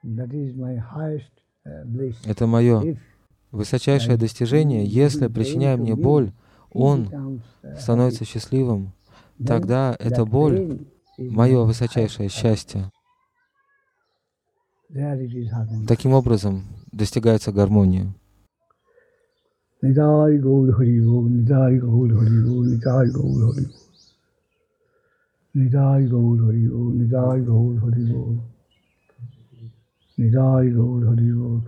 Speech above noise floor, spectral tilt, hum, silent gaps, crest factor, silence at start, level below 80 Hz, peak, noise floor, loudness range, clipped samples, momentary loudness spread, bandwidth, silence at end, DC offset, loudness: 56 dB; -8.5 dB/octave; none; none; 16 dB; 0.05 s; -48 dBFS; -4 dBFS; -75 dBFS; 6 LU; under 0.1%; 14 LU; 10.5 kHz; 0 s; under 0.1%; -20 LUFS